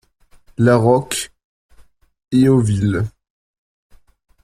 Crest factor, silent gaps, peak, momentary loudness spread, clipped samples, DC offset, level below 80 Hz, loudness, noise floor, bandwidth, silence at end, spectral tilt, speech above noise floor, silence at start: 18 dB; 1.44-1.69 s; -2 dBFS; 14 LU; under 0.1%; under 0.1%; -48 dBFS; -16 LUFS; -49 dBFS; 15.5 kHz; 1.35 s; -6.5 dB/octave; 34 dB; 0.6 s